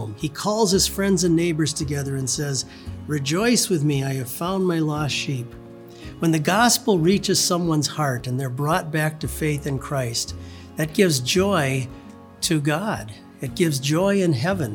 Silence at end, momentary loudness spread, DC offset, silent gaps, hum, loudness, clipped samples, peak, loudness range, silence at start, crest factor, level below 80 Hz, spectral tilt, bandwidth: 0 s; 13 LU; under 0.1%; none; none; -22 LUFS; under 0.1%; -4 dBFS; 3 LU; 0 s; 18 dB; -46 dBFS; -4.5 dB/octave; over 20 kHz